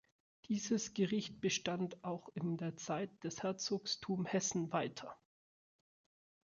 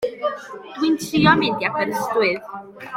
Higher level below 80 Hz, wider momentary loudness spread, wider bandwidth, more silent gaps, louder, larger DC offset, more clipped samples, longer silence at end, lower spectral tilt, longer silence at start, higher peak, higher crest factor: second, -76 dBFS vs -54 dBFS; second, 8 LU vs 19 LU; second, 7.4 kHz vs 16.5 kHz; neither; second, -39 LUFS vs -20 LUFS; neither; neither; first, 1.35 s vs 0 s; about the same, -4.5 dB/octave vs -5 dB/octave; first, 0.5 s vs 0 s; second, -20 dBFS vs -2 dBFS; about the same, 20 dB vs 20 dB